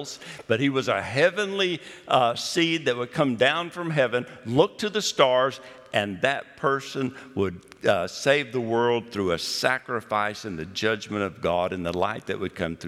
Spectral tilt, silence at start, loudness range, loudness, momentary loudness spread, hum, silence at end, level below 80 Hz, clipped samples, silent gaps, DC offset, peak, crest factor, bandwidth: -4.5 dB/octave; 0 s; 3 LU; -25 LUFS; 8 LU; none; 0 s; -64 dBFS; under 0.1%; none; under 0.1%; -4 dBFS; 20 dB; 15 kHz